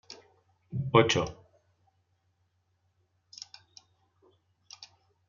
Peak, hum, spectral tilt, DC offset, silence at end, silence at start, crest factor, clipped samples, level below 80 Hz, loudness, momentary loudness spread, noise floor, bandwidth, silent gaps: -8 dBFS; none; -4 dB/octave; under 0.1%; 0.45 s; 0.1 s; 28 dB; under 0.1%; -64 dBFS; -27 LUFS; 28 LU; -75 dBFS; 7.2 kHz; none